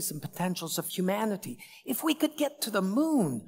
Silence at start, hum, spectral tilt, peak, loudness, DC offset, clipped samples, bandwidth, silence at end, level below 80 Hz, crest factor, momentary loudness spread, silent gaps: 0 s; none; -4.5 dB/octave; -12 dBFS; -30 LUFS; under 0.1%; under 0.1%; 16.5 kHz; 0 s; -80 dBFS; 18 dB; 8 LU; none